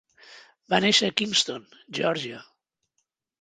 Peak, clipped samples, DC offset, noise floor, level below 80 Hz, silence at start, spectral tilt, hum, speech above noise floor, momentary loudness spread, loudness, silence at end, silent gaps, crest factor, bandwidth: -4 dBFS; under 0.1%; under 0.1%; -78 dBFS; -68 dBFS; 0.3 s; -2.5 dB/octave; none; 52 dB; 17 LU; -23 LUFS; 1 s; none; 24 dB; 9.6 kHz